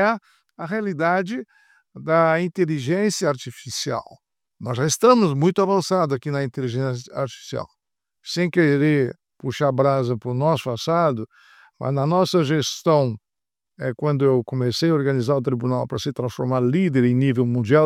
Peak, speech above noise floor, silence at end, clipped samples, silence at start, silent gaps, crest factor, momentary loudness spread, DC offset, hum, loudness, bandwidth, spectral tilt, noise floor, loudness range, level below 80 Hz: -2 dBFS; 68 dB; 0 s; under 0.1%; 0 s; none; 18 dB; 12 LU; under 0.1%; none; -21 LUFS; 15 kHz; -6 dB/octave; -89 dBFS; 2 LU; -64 dBFS